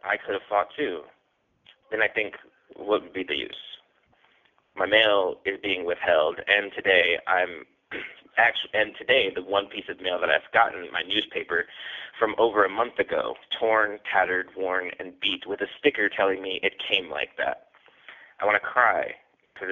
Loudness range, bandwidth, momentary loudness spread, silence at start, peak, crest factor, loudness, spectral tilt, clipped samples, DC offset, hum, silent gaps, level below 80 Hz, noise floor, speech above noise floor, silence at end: 6 LU; 6.8 kHz; 14 LU; 0.05 s; -4 dBFS; 22 dB; -25 LUFS; 0.5 dB/octave; under 0.1%; under 0.1%; none; none; -66 dBFS; -70 dBFS; 44 dB; 0 s